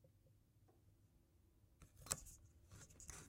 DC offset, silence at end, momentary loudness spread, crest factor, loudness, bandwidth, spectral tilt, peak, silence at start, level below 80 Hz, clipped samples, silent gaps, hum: under 0.1%; 0 s; 18 LU; 40 dB; -49 LUFS; 16 kHz; -2 dB/octave; -20 dBFS; 0 s; -70 dBFS; under 0.1%; none; none